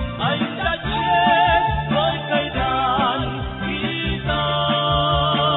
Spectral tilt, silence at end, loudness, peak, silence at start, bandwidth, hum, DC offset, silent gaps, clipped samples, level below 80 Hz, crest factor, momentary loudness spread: -10.5 dB/octave; 0 s; -20 LUFS; -4 dBFS; 0 s; 4.1 kHz; none; under 0.1%; none; under 0.1%; -34 dBFS; 16 dB; 7 LU